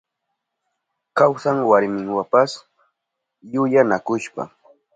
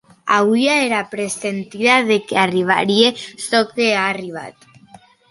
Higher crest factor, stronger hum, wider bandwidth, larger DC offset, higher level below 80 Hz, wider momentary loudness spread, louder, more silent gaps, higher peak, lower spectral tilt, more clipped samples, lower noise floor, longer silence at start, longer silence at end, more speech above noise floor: about the same, 20 dB vs 16 dB; neither; second, 9.2 kHz vs 11.5 kHz; neither; about the same, -68 dBFS vs -64 dBFS; first, 14 LU vs 11 LU; second, -19 LUFS vs -16 LUFS; neither; about the same, -2 dBFS vs 0 dBFS; first, -6 dB/octave vs -3.5 dB/octave; neither; first, -80 dBFS vs -47 dBFS; first, 1.15 s vs 0.25 s; second, 0.5 s vs 0.8 s; first, 62 dB vs 29 dB